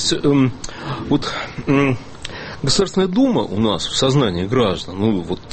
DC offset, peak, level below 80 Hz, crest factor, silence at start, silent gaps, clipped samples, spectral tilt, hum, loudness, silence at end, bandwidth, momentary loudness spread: under 0.1%; -4 dBFS; -40 dBFS; 14 dB; 0 s; none; under 0.1%; -5 dB/octave; none; -18 LUFS; 0 s; 8.8 kHz; 11 LU